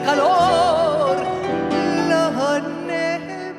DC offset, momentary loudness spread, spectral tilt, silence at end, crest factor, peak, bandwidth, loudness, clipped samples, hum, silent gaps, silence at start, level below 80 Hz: under 0.1%; 8 LU; -5 dB/octave; 0 s; 14 dB; -4 dBFS; 13.5 kHz; -19 LUFS; under 0.1%; none; none; 0 s; -52 dBFS